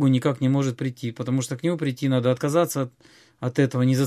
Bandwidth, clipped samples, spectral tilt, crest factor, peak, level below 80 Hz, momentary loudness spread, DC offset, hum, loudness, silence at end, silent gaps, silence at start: 14.5 kHz; under 0.1%; -6.5 dB/octave; 16 dB; -6 dBFS; -66 dBFS; 8 LU; under 0.1%; none; -24 LUFS; 0 s; none; 0 s